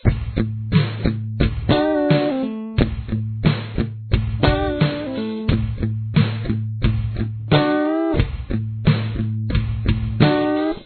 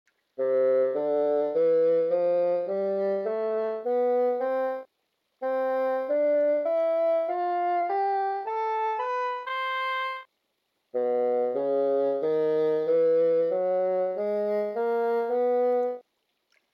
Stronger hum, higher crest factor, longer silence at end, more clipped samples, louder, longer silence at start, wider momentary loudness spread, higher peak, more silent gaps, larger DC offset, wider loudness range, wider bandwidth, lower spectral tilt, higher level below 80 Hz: neither; first, 20 dB vs 10 dB; second, 0 s vs 0.8 s; neither; first, -21 LUFS vs -26 LUFS; second, 0.05 s vs 0.4 s; about the same, 7 LU vs 6 LU; first, 0 dBFS vs -16 dBFS; neither; neither; about the same, 1 LU vs 3 LU; second, 4.6 kHz vs 5.4 kHz; first, -10.5 dB/octave vs -7 dB/octave; first, -30 dBFS vs -82 dBFS